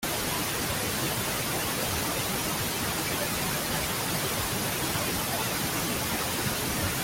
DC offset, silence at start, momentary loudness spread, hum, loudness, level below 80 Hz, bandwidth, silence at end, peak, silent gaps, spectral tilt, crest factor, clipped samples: under 0.1%; 0 s; 0 LU; none; -28 LUFS; -48 dBFS; 17 kHz; 0 s; -16 dBFS; none; -2.5 dB/octave; 14 dB; under 0.1%